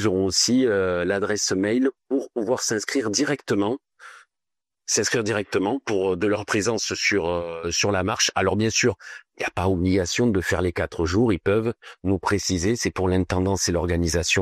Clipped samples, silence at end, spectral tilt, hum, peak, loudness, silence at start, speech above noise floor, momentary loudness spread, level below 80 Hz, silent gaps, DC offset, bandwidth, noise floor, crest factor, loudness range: under 0.1%; 0 s; -4 dB/octave; none; -6 dBFS; -23 LUFS; 0 s; 66 dB; 6 LU; -44 dBFS; none; under 0.1%; 14.5 kHz; -89 dBFS; 16 dB; 3 LU